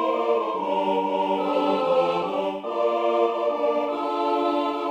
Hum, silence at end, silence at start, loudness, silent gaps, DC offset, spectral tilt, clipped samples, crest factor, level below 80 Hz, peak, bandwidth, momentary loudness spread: none; 0 s; 0 s; -24 LUFS; none; under 0.1%; -6 dB/octave; under 0.1%; 14 dB; -72 dBFS; -10 dBFS; 9.2 kHz; 4 LU